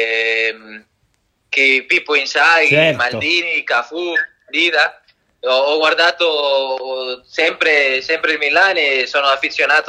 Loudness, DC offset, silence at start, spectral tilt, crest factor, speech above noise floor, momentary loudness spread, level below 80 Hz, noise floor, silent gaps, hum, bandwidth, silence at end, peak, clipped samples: -14 LUFS; under 0.1%; 0 s; -3 dB/octave; 16 dB; 48 dB; 8 LU; -64 dBFS; -64 dBFS; none; none; 11 kHz; 0 s; 0 dBFS; under 0.1%